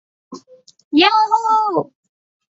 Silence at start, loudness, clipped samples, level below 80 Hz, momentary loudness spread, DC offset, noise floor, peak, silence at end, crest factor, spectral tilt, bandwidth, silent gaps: 0.3 s; -15 LUFS; under 0.1%; -70 dBFS; 10 LU; under 0.1%; -44 dBFS; -2 dBFS; 0.7 s; 18 dB; -4 dB/octave; 7.8 kHz; 0.84-0.91 s